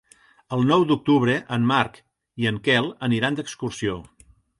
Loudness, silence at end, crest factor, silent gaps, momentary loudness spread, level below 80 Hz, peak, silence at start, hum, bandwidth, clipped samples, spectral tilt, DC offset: -22 LUFS; 0.6 s; 18 dB; none; 9 LU; -56 dBFS; -4 dBFS; 0.5 s; none; 11.5 kHz; under 0.1%; -6 dB/octave; under 0.1%